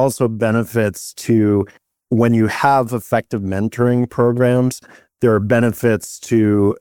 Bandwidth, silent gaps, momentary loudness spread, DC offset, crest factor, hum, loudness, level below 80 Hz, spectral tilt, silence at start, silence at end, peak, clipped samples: 18.5 kHz; none; 7 LU; 0.2%; 14 dB; none; -17 LUFS; -52 dBFS; -7 dB/octave; 0 s; 0.05 s; -2 dBFS; under 0.1%